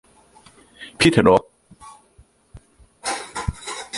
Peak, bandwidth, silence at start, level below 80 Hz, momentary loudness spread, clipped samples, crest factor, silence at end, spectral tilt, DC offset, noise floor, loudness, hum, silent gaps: -2 dBFS; 11.5 kHz; 0.8 s; -42 dBFS; 20 LU; under 0.1%; 22 dB; 0 s; -4.5 dB/octave; under 0.1%; -55 dBFS; -20 LUFS; none; none